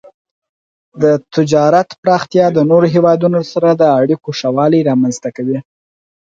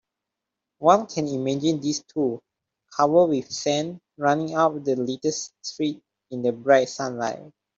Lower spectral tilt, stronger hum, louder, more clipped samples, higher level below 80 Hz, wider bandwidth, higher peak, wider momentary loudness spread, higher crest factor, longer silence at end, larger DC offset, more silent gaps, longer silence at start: first, -7 dB/octave vs -5 dB/octave; neither; first, -13 LUFS vs -24 LUFS; neither; first, -56 dBFS vs -70 dBFS; about the same, 7.8 kHz vs 7.8 kHz; about the same, 0 dBFS vs -2 dBFS; second, 7 LU vs 13 LU; second, 12 dB vs 22 dB; first, 0.6 s vs 0.3 s; neither; first, 1.98-2.03 s vs none; first, 0.95 s vs 0.8 s